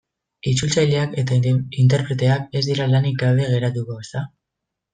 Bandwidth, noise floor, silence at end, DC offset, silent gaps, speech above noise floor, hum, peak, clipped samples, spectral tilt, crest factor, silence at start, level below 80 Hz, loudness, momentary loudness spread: 9.4 kHz; -81 dBFS; 0.65 s; under 0.1%; none; 63 dB; none; -6 dBFS; under 0.1%; -6 dB/octave; 14 dB; 0.45 s; -52 dBFS; -20 LUFS; 11 LU